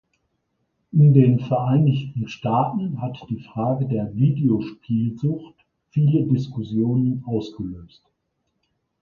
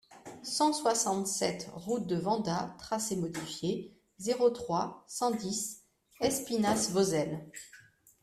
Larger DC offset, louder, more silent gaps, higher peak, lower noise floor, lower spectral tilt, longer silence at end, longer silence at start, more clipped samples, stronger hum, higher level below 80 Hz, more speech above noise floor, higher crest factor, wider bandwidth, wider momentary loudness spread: neither; first, -21 LUFS vs -32 LUFS; neither; first, -2 dBFS vs -14 dBFS; first, -74 dBFS vs -59 dBFS; first, -10 dB/octave vs -4 dB/octave; first, 1.15 s vs 0.45 s; first, 0.95 s vs 0.1 s; neither; neither; first, -54 dBFS vs -68 dBFS; first, 54 dB vs 27 dB; about the same, 20 dB vs 20 dB; second, 6.2 kHz vs 15 kHz; about the same, 13 LU vs 13 LU